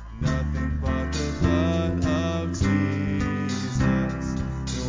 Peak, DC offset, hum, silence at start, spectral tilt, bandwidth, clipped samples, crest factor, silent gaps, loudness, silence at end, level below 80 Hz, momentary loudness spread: -10 dBFS; under 0.1%; none; 0 s; -6.5 dB/octave; 7.6 kHz; under 0.1%; 14 dB; none; -25 LUFS; 0 s; -32 dBFS; 5 LU